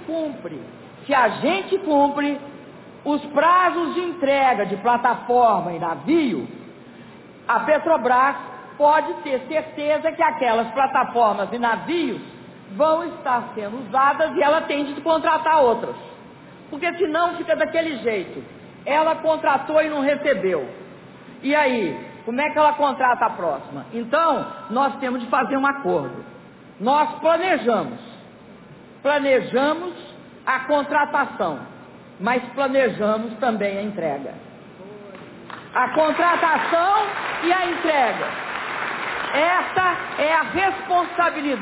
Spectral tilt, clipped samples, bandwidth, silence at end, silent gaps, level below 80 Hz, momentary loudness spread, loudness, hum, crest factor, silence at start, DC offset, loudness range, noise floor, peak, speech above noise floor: -8.5 dB/octave; under 0.1%; 4 kHz; 0 s; none; -60 dBFS; 16 LU; -21 LUFS; none; 16 dB; 0 s; under 0.1%; 3 LU; -44 dBFS; -6 dBFS; 24 dB